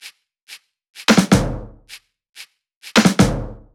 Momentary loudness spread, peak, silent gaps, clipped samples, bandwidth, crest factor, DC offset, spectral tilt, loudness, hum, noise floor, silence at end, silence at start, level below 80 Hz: 17 LU; 0 dBFS; 0.43-0.47 s, 0.89-0.93 s, 2.29-2.33 s, 2.76-2.81 s; under 0.1%; 17.5 kHz; 20 dB; under 0.1%; -4.5 dB/octave; -16 LUFS; none; -44 dBFS; 0.2 s; 0.05 s; -36 dBFS